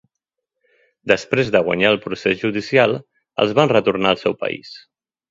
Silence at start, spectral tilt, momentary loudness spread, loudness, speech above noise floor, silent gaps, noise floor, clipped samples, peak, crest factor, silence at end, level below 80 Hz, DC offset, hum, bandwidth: 1.05 s; -5.5 dB/octave; 13 LU; -18 LUFS; 63 dB; none; -81 dBFS; under 0.1%; 0 dBFS; 20 dB; 0.55 s; -56 dBFS; under 0.1%; none; 7.8 kHz